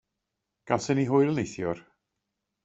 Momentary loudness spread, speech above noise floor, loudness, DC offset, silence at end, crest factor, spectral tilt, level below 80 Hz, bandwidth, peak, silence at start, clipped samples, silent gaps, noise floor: 10 LU; 58 dB; -27 LUFS; under 0.1%; 0.85 s; 22 dB; -6.5 dB/octave; -64 dBFS; 8 kHz; -8 dBFS; 0.65 s; under 0.1%; none; -84 dBFS